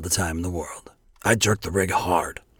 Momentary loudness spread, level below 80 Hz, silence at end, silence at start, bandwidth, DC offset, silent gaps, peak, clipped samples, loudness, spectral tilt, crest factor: 12 LU; -44 dBFS; 0.25 s; 0 s; 19 kHz; under 0.1%; none; -6 dBFS; under 0.1%; -23 LUFS; -3.5 dB/octave; 20 dB